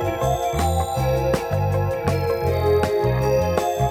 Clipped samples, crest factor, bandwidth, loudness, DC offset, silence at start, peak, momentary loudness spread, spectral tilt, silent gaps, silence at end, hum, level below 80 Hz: under 0.1%; 16 dB; 17 kHz; -21 LUFS; under 0.1%; 0 s; -4 dBFS; 3 LU; -6.5 dB/octave; none; 0 s; none; -34 dBFS